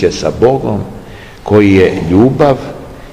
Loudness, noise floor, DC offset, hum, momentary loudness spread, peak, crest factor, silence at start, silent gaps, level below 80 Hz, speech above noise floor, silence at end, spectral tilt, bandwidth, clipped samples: -10 LUFS; -30 dBFS; 0.7%; none; 19 LU; 0 dBFS; 10 dB; 0 s; none; -34 dBFS; 21 dB; 0 s; -7 dB/octave; 12 kHz; 2%